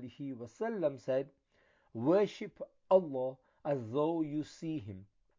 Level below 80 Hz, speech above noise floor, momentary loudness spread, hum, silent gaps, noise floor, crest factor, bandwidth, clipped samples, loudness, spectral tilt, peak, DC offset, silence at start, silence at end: -74 dBFS; 37 dB; 17 LU; none; none; -71 dBFS; 20 dB; 7.6 kHz; under 0.1%; -35 LUFS; -7.5 dB/octave; -14 dBFS; under 0.1%; 0 s; 0.35 s